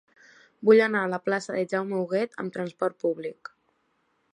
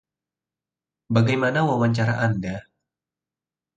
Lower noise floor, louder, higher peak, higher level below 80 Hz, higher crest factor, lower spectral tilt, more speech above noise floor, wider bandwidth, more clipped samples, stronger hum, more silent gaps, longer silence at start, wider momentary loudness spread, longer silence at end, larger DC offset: second, -71 dBFS vs under -90 dBFS; second, -26 LUFS vs -22 LUFS; second, -8 dBFS vs -4 dBFS; second, -80 dBFS vs -56 dBFS; about the same, 20 dB vs 20 dB; second, -6 dB/octave vs -7.5 dB/octave; second, 46 dB vs over 69 dB; first, 10.5 kHz vs 8.2 kHz; neither; neither; neither; second, 0.6 s vs 1.1 s; first, 15 LU vs 9 LU; second, 1 s vs 1.15 s; neither